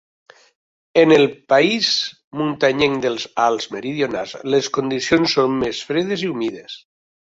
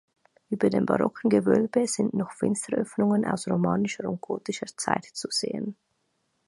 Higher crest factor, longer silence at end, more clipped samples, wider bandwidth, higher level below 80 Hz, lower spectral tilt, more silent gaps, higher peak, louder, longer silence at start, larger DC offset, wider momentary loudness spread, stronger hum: second, 18 dB vs 24 dB; second, 0.45 s vs 0.75 s; neither; second, 7.8 kHz vs 11.5 kHz; first, -56 dBFS vs -64 dBFS; about the same, -4.5 dB/octave vs -5.5 dB/octave; first, 2.24-2.31 s vs none; about the same, -2 dBFS vs -4 dBFS; first, -18 LUFS vs -26 LUFS; first, 0.95 s vs 0.5 s; neither; about the same, 11 LU vs 9 LU; neither